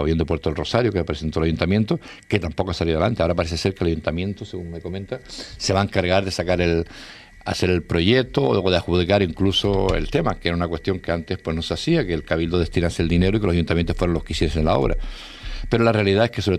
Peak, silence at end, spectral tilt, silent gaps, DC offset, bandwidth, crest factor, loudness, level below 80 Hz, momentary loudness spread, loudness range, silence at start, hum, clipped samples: 0 dBFS; 0 s; -6 dB/octave; none; under 0.1%; 12.5 kHz; 20 dB; -21 LUFS; -34 dBFS; 12 LU; 4 LU; 0 s; none; under 0.1%